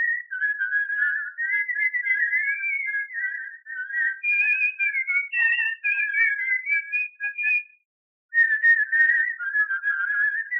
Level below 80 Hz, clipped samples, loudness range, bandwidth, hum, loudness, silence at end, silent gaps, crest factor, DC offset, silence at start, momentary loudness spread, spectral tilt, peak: under -90 dBFS; under 0.1%; 3 LU; 5.8 kHz; none; -22 LUFS; 0 s; 7.85-8.29 s; 14 dB; under 0.1%; 0 s; 8 LU; 6 dB/octave; -10 dBFS